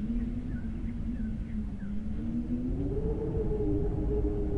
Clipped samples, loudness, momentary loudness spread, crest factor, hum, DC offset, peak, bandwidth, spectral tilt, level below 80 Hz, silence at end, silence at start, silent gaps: under 0.1%; -34 LUFS; 6 LU; 12 dB; none; under 0.1%; -18 dBFS; 4.5 kHz; -10.5 dB/octave; -36 dBFS; 0 s; 0 s; none